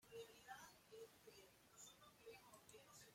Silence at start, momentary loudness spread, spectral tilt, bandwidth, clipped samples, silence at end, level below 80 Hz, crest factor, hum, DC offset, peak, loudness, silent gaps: 0 s; 6 LU; -2 dB/octave; 16.5 kHz; under 0.1%; 0 s; -88 dBFS; 18 dB; none; under 0.1%; -46 dBFS; -63 LUFS; none